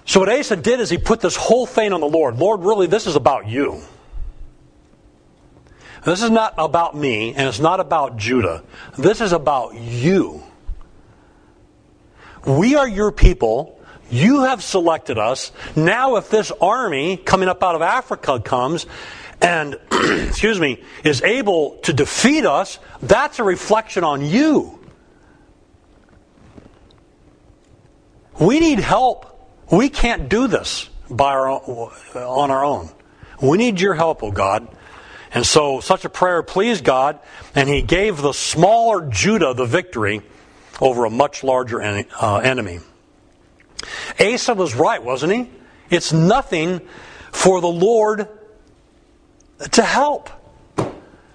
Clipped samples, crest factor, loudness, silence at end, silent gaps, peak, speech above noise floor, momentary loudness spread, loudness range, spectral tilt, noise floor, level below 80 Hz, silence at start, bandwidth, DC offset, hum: under 0.1%; 18 dB; -17 LUFS; 0.35 s; none; 0 dBFS; 35 dB; 13 LU; 4 LU; -4.5 dB/octave; -52 dBFS; -32 dBFS; 0.05 s; 10.5 kHz; under 0.1%; none